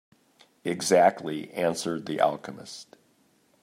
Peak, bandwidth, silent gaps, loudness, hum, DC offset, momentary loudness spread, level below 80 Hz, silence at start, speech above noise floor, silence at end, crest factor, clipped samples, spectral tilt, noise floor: -8 dBFS; 15.5 kHz; none; -26 LUFS; none; under 0.1%; 20 LU; -76 dBFS; 0.65 s; 39 dB; 0.8 s; 20 dB; under 0.1%; -4 dB/octave; -65 dBFS